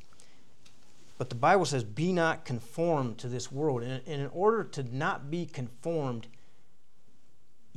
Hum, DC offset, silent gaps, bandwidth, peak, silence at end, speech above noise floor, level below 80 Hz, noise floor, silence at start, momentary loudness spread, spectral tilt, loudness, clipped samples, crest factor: none; 0.8%; none; 13 kHz; -10 dBFS; 1.5 s; 39 dB; -74 dBFS; -69 dBFS; 1.2 s; 12 LU; -6 dB/octave; -31 LUFS; under 0.1%; 22 dB